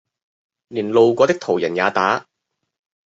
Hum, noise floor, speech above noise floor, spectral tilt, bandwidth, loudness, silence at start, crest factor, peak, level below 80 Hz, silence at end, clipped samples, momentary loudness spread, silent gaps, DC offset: none; -77 dBFS; 60 dB; -5.5 dB/octave; 7.8 kHz; -18 LUFS; 0.7 s; 18 dB; -2 dBFS; -64 dBFS; 0.85 s; under 0.1%; 10 LU; none; under 0.1%